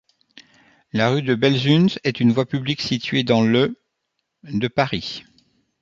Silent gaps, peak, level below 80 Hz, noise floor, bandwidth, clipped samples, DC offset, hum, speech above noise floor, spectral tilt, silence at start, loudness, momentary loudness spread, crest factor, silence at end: none; -2 dBFS; -56 dBFS; -76 dBFS; 7.6 kHz; under 0.1%; under 0.1%; none; 57 dB; -6.5 dB/octave; 0.95 s; -20 LUFS; 11 LU; 18 dB; 0.6 s